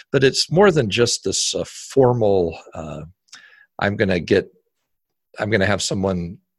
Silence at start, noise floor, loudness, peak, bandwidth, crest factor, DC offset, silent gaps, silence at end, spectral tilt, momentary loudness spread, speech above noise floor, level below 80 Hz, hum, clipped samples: 0.15 s; -75 dBFS; -19 LUFS; -2 dBFS; 12.5 kHz; 18 dB; under 0.1%; none; 0.25 s; -4.5 dB/octave; 17 LU; 56 dB; -44 dBFS; none; under 0.1%